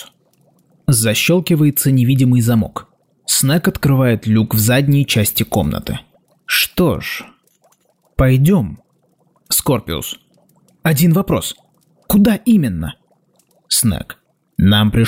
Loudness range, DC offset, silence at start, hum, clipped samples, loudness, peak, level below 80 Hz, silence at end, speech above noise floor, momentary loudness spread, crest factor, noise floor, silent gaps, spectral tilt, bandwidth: 4 LU; under 0.1%; 0 s; none; under 0.1%; -15 LUFS; -4 dBFS; -36 dBFS; 0 s; 45 dB; 14 LU; 12 dB; -59 dBFS; none; -5 dB/octave; 16 kHz